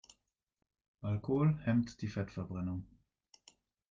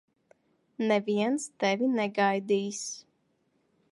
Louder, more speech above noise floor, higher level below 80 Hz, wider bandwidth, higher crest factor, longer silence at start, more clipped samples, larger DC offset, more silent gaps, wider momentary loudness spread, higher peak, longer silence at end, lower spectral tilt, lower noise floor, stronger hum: second, -36 LUFS vs -28 LUFS; about the same, 45 dB vs 45 dB; first, -64 dBFS vs -82 dBFS; second, 7.6 kHz vs 11.5 kHz; about the same, 16 dB vs 18 dB; first, 1 s vs 0.8 s; neither; neither; neither; about the same, 10 LU vs 9 LU; second, -20 dBFS vs -12 dBFS; first, 1.05 s vs 0.9 s; first, -8.5 dB/octave vs -4.5 dB/octave; first, -80 dBFS vs -72 dBFS; neither